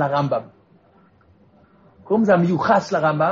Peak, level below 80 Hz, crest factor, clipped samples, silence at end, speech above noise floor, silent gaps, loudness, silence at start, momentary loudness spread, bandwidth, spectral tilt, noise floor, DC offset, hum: -4 dBFS; -62 dBFS; 16 dB; under 0.1%; 0 s; 37 dB; none; -19 LUFS; 0 s; 7 LU; 7.4 kHz; -6 dB/octave; -55 dBFS; under 0.1%; none